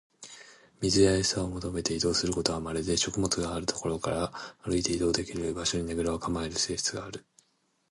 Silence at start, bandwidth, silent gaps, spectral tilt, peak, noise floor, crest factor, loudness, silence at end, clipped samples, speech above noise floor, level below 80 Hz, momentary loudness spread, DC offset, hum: 0.2 s; 11.5 kHz; none; -4 dB/octave; -8 dBFS; -72 dBFS; 22 dB; -29 LUFS; 0.7 s; under 0.1%; 43 dB; -48 dBFS; 14 LU; under 0.1%; none